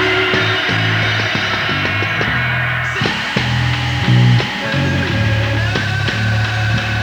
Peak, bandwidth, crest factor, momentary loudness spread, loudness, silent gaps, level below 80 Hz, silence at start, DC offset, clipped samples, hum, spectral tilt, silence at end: 0 dBFS; 10 kHz; 16 dB; 4 LU; -15 LUFS; none; -34 dBFS; 0 s; under 0.1%; under 0.1%; none; -5.5 dB/octave; 0 s